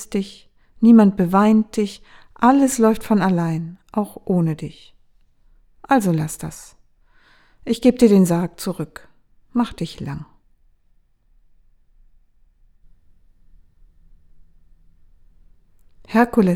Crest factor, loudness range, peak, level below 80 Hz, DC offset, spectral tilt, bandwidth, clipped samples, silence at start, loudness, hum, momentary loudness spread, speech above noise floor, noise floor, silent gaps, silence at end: 20 dB; 14 LU; 0 dBFS; -50 dBFS; under 0.1%; -6.5 dB/octave; 16.5 kHz; under 0.1%; 0 s; -18 LUFS; none; 18 LU; 40 dB; -58 dBFS; none; 0 s